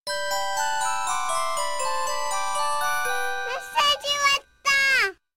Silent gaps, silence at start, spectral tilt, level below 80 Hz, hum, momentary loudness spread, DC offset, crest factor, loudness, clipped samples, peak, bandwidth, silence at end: 0.00-0.04 s; 0 s; 1 dB/octave; -58 dBFS; none; 7 LU; 2%; 16 dB; -23 LUFS; under 0.1%; -10 dBFS; 17 kHz; 0 s